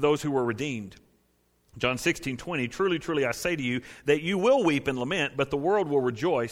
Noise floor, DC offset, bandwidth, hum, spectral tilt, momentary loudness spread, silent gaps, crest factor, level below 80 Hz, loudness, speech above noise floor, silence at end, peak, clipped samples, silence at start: -68 dBFS; under 0.1%; 16.5 kHz; none; -5 dB/octave; 8 LU; none; 16 dB; -56 dBFS; -27 LUFS; 42 dB; 0 s; -10 dBFS; under 0.1%; 0 s